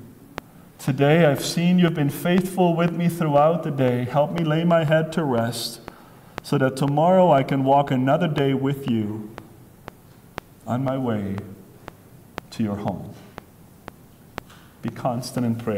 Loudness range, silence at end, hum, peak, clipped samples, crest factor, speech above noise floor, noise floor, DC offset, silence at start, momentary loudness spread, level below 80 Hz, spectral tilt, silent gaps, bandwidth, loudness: 11 LU; 0 s; none; -4 dBFS; under 0.1%; 18 dB; 24 dB; -45 dBFS; under 0.1%; 0 s; 22 LU; -56 dBFS; -6.5 dB/octave; none; 16.5 kHz; -21 LUFS